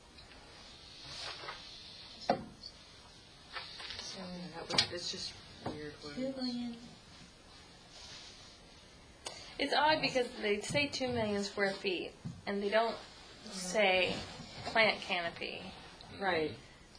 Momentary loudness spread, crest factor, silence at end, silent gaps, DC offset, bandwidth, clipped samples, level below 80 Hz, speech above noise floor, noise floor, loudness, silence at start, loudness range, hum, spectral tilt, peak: 24 LU; 26 dB; 0 s; none; under 0.1%; 11 kHz; under 0.1%; -64 dBFS; 22 dB; -57 dBFS; -35 LUFS; 0 s; 11 LU; none; -3.5 dB/octave; -10 dBFS